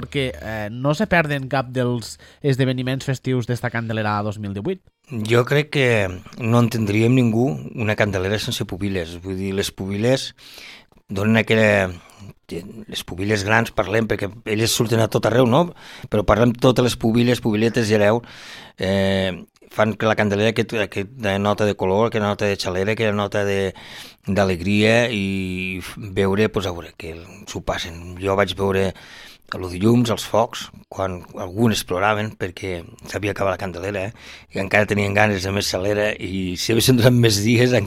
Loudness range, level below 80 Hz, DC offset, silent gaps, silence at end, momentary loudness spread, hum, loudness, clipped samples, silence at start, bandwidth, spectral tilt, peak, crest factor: 5 LU; -46 dBFS; under 0.1%; none; 0 s; 15 LU; none; -20 LUFS; under 0.1%; 0 s; 16 kHz; -5.5 dB/octave; 0 dBFS; 20 dB